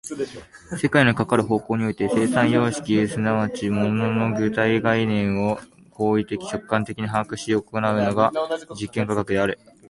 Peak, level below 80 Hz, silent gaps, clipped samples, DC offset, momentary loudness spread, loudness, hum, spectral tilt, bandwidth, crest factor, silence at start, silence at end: -4 dBFS; -52 dBFS; none; under 0.1%; under 0.1%; 9 LU; -22 LUFS; none; -6 dB/octave; 11.5 kHz; 18 dB; 0.05 s; 0.35 s